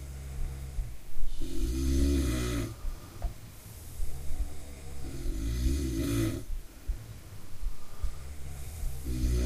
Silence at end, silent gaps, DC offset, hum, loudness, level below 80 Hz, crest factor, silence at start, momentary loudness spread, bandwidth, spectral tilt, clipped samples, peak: 0 s; none; under 0.1%; none; -36 LUFS; -34 dBFS; 16 dB; 0 s; 15 LU; 15.5 kHz; -6 dB/octave; under 0.1%; -14 dBFS